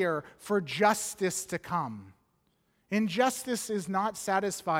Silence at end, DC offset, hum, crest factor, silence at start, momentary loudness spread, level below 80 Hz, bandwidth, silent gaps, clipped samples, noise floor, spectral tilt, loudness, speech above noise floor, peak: 0 s; under 0.1%; none; 20 dB; 0 s; 7 LU; -70 dBFS; 17 kHz; none; under 0.1%; -73 dBFS; -4 dB/octave; -30 LUFS; 43 dB; -10 dBFS